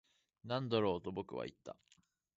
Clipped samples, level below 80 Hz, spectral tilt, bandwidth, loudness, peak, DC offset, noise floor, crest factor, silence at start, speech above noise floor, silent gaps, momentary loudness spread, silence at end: under 0.1%; -70 dBFS; -5 dB/octave; 7.6 kHz; -40 LUFS; -20 dBFS; under 0.1%; -74 dBFS; 22 dB; 0.45 s; 35 dB; none; 21 LU; 0.65 s